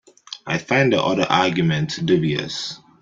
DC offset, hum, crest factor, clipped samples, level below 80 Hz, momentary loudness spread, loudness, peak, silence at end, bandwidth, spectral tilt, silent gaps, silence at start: under 0.1%; none; 18 dB; under 0.1%; -56 dBFS; 12 LU; -20 LUFS; -2 dBFS; 0.25 s; 7.6 kHz; -5.5 dB/octave; none; 0.3 s